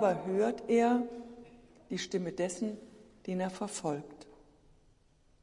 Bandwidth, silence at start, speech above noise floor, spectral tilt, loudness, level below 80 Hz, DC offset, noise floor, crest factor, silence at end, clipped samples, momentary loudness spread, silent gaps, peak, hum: 11.5 kHz; 0 s; 34 dB; -5.5 dB/octave; -34 LUFS; -68 dBFS; under 0.1%; -66 dBFS; 18 dB; 1.1 s; under 0.1%; 20 LU; none; -16 dBFS; none